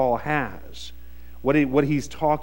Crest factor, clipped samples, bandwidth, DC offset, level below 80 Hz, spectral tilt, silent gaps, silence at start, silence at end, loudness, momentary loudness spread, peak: 18 dB; under 0.1%; 16.5 kHz; 1%; -44 dBFS; -6.5 dB/octave; none; 0 s; 0 s; -23 LUFS; 19 LU; -6 dBFS